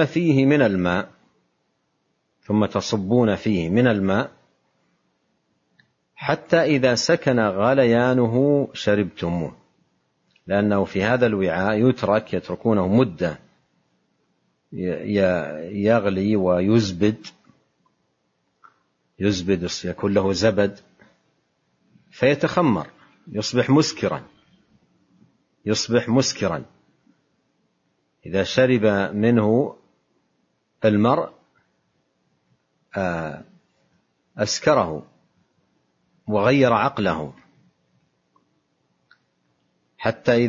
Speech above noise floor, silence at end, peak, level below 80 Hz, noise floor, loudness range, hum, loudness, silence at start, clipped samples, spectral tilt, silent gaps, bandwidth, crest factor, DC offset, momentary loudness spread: 51 dB; 0 s; -4 dBFS; -56 dBFS; -71 dBFS; 6 LU; none; -21 LUFS; 0 s; under 0.1%; -6 dB/octave; none; 7.6 kHz; 18 dB; under 0.1%; 11 LU